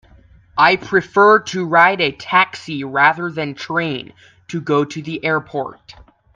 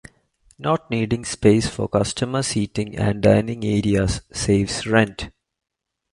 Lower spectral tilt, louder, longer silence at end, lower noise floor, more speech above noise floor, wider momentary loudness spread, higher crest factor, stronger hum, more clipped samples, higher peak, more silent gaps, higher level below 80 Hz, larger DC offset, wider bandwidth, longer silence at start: about the same, -5 dB/octave vs -5.5 dB/octave; first, -16 LUFS vs -21 LUFS; second, 0.6 s vs 0.85 s; second, -48 dBFS vs -59 dBFS; second, 31 dB vs 39 dB; first, 14 LU vs 7 LU; about the same, 18 dB vs 18 dB; neither; neither; about the same, 0 dBFS vs -2 dBFS; neither; second, -54 dBFS vs -40 dBFS; neither; second, 9 kHz vs 11.5 kHz; about the same, 0.55 s vs 0.6 s